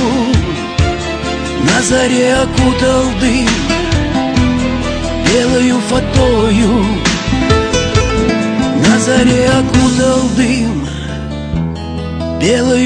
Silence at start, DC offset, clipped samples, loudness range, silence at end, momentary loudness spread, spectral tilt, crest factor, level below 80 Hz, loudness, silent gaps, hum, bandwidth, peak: 0 s; under 0.1%; under 0.1%; 2 LU; 0 s; 8 LU; -5 dB/octave; 12 dB; -24 dBFS; -12 LUFS; none; none; 10.5 kHz; 0 dBFS